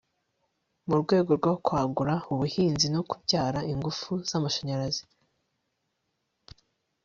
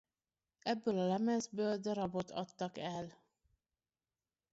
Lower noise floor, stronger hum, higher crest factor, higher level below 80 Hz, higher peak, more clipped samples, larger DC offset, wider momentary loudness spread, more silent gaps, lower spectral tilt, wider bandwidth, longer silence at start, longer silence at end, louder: second, -79 dBFS vs under -90 dBFS; neither; about the same, 20 dB vs 16 dB; first, -58 dBFS vs -76 dBFS; first, -10 dBFS vs -24 dBFS; neither; neither; about the same, 7 LU vs 9 LU; neither; about the same, -5.5 dB/octave vs -5.5 dB/octave; about the same, 7.6 kHz vs 7.6 kHz; first, 0.85 s vs 0.65 s; first, 2.05 s vs 1.4 s; first, -27 LUFS vs -39 LUFS